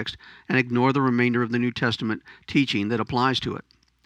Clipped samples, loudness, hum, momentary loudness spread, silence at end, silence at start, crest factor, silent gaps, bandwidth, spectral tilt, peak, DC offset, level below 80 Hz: under 0.1%; -24 LUFS; none; 12 LU; 0.45 s; 0 s; 18 dB; none; 9.6 kHz; -6.5 dB/octave; -6 dBFS; under 0.1%; -56 dBFS